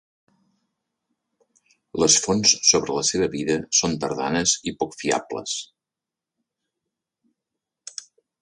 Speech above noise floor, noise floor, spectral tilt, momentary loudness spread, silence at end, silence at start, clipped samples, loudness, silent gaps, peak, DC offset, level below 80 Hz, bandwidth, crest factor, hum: 66 dB; -88 dBFS; -2 dB/octave; 17 LU; 2.75 s; 1.95 s; under 0.1%; -20 LUFS; none; -2 dBFS; under 0.1%; -56 dBFS; 11.5 kHz; 24 dB; none